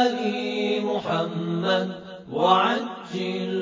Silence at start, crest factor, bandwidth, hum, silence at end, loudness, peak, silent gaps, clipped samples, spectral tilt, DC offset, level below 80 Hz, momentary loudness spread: 0 s; 20 dB; 7.6 kHz; none; 0 s; -24 LUFS; -4 dBFS; none; under 0.1%; -6 dB/octave; under 0.1%; -68 dBFS; 12 LU